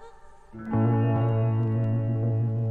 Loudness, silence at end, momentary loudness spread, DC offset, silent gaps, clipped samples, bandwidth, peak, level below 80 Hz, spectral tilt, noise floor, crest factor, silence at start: -25 LUFS; 0 s; 3 LU; under 0.1%; none; under 0.1%; 3 kHz; -14 dBFS; -52 dBFS; -11.5 dB/octave; -47 dBFS; 12 dB; 0 s